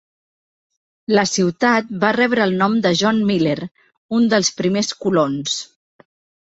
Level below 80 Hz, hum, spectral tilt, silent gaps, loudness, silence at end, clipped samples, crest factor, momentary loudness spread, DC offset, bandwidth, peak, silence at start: -60 dBFS; none; -4.5 dB/octave; 3.97-4.09 s; -18 LUFS; 0.85 s; under 0.1%; 18 dB; 8 LU; under 0.1%; 8.2 kHz; -2 dBFS; 1.1 s